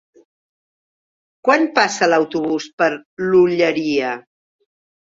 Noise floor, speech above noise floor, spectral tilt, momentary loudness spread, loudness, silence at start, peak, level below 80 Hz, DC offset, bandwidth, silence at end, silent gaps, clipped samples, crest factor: under -90 dBFS; over 73 dB; -4.5 dB/octave; 8 LU; -17 LUFS; 1.45 s; -2 dBFS; -62 dBFS; under 0.1%; 7.8 kHz; 0.9 s; 2.73-2.78 s, 3.05-3.17 s; under 0.1%; 18 dB